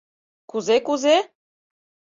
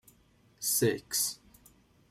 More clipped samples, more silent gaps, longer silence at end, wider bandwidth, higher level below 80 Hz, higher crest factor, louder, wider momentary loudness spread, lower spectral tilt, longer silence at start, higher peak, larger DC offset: neither; neither; first, 0.9 s vs 0.75 s; second, 7.6 kHz vs 16 kHz; second, -72 dBFS vs -66 dBFS; about the same, 18 dB vs 18 dB; first, -20 LUFS vs -30 LUFS; first, 13 LU vs 8 LU; about the same, -3 dB/octave vs -3 dB/octave; about the same, 0.55 s vs 0.6 s; first, -6 dBFS vs -16 dBFS; neither